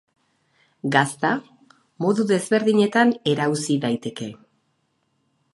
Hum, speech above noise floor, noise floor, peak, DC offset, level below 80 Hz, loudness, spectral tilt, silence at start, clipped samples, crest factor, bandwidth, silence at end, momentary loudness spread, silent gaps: none; 49 dB; -70 dBFS; -2 dBFS; under 0.1%; -70 dBFS; -21 LUFS; -5 dB/octave; 0.85 s; under 0.1%; 22 dB; 11.5 kHz; 1.2 s; 12 LU; none